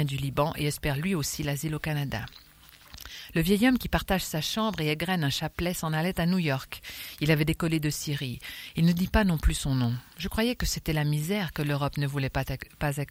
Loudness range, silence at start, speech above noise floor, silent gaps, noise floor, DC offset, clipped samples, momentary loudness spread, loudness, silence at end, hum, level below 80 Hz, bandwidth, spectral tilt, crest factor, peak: 2 LU; 0 s; 23 dB; none; -51 dBFS; under 0.1%; under 0.1%; 10 LU; -28 LUFS; 0.05 s; none; -40 dBFS; 16.5 kHz; -5 dB/octave; 20 dB; -8 dBFS